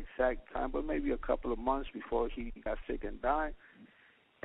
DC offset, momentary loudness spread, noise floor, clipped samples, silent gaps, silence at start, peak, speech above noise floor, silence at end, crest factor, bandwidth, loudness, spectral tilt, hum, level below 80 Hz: under 0.1%; 7 LU; -65 dBFS; under 0.1%; none; 0 s; -16 dBFS; 31 dB; 0.6 s; 18 dB; 4 kHz; -36 LUFS; -4.5 dB/octave; none; -44 dBFS